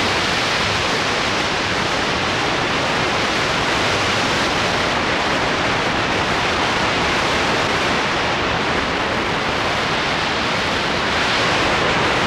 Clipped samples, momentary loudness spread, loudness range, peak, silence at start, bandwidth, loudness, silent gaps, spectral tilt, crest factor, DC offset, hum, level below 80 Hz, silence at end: under 0.1%; 2 LU; 1 LU; -8 dBFS; 0 s; 16 kHz; -18 LUFS; none; -3.5 dB/octave; 12 dB; under 0.1%; none; -38 dBFS; 0 s